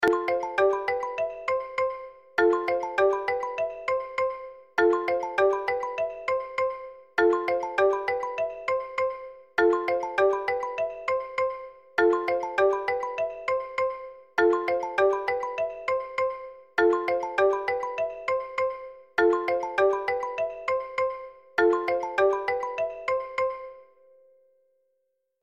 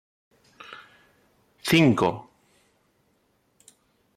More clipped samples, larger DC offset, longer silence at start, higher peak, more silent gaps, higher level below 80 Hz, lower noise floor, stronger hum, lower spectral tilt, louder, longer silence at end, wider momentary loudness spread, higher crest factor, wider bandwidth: neither; neither; second, 0 s vs 0.7 s; about the same, -10 dBFS vs -8 dBFS; neither; about the same, -62 dBFS vs -62 dBFS; first, -76 dBFS vs -68 dBFS; neither; about the same, -4.5 dB/octave vs -5.5 dB/octave; second, -27 LUFS vs -22 LUFS; second, 1.6 s vs 1.95 s; second, 8 LU vs 27 LU; about the same, 18 dB vs 22 dB; second, 9 kHz vs 16 kHz